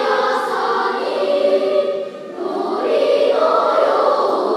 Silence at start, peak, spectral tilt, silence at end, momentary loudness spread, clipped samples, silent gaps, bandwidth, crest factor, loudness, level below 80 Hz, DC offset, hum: 0 s; -2 dBFS; -4 dB/octave; 0 s; 8 LU; under 0.1%; none; 11.5 kHz; 14 dB; -17 LUFS; -82 dBFS; under 0.1%; none